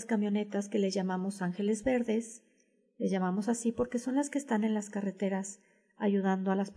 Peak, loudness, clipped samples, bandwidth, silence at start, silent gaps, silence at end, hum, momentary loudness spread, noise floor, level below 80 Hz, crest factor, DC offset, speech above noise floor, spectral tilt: -18 dBFS; -32 LUFS; under 0.1%; 11 kHz; 0 s; none; 0.05 s; none; 7 LU; -71 dBFS; -66 dBFS; 14 dB; under 0.1%; 39 dB; -6 dB/octave